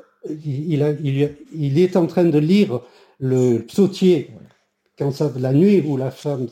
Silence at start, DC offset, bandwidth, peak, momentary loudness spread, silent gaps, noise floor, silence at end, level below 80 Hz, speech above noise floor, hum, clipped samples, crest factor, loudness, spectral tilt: 0.25 s; under 0.1%; 16 kHz; -4 dBFS; 11 LU; none; -61 dBFS; 0 s; -62 dBFS; 43 dB; none; under 0.1%; 14 dB; -19 LUFS; -8 dB/octave